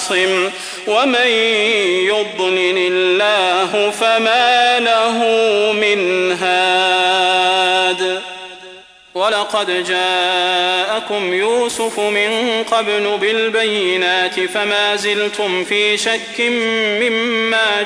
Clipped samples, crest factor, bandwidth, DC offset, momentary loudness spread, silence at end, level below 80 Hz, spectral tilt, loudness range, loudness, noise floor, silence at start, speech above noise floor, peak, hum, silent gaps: under 0.1%; 14 dB; 11 kHz; under 0.1%; 5 LU; 0 s; -60 dBFS; -2 dB/octave; 3 LU; -14 LUFS; -40 dBFS; 0 s; 24 dB; -2 dBFS; none; none